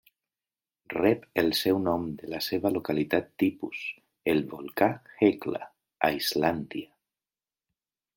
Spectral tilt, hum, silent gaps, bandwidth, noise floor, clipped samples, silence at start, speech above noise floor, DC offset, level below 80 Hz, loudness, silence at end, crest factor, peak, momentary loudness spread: -5 dB/octave; none; none; 17 kHz; under -90 dBFS; under 0.1%; 0.9 s; over 63 dB; under 0.1%; -64 dBFS; -28 LUFS; 1.3 s; 24 dB; -6 dBFS; 11 LU